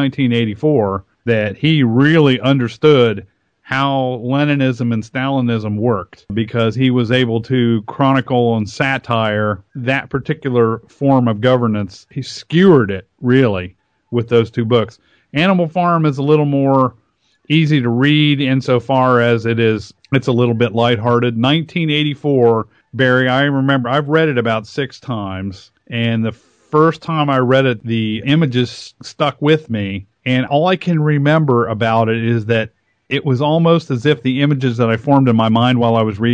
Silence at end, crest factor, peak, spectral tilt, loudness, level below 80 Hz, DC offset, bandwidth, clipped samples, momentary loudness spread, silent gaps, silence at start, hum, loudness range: 0 s; 14 dB; 0 dBFS; -7.5 dB/octave; -15 LUFS; -54 dBFS; under 0.1%; 9 kHz; under 0.1%; 9 LU; none; 0 s; none; 3 LU